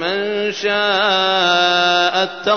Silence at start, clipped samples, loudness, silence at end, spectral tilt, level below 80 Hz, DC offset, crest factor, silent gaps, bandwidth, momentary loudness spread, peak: 0 s; under 0.1%; -15 LUFS; 0 s; -2.5 dB/octave; -62 dBFS; 0.3%; 14 dB; none; 6.6 kHz; 6 LU; -4 dBFS